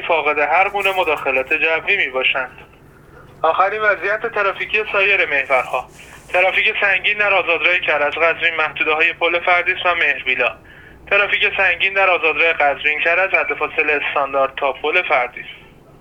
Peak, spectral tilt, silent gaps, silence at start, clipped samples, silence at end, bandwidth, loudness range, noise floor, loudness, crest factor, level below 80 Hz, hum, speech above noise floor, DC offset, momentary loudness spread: 0 dBFS; -3.5 dB/octave; none; 0 s; under 0.1%; 0.4 s; 19 kHz; 3 LU; -44 dBFS; -16 LUFS; 16 dB; -52 dBFS; none; 27 dB; under 0.1%; 5 LU